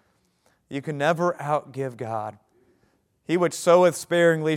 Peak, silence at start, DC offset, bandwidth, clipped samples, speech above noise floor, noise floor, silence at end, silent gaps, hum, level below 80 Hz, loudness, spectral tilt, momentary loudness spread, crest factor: -4 dBFS; 0.7 s; under 0.1%; 15.5 kHz; under 0.1%; 44 dB; -67 dBFS; 0 s; none; none; -74 dBFS; -23 LUFS; -5.5 dB/octave; 16 LU; 20 dB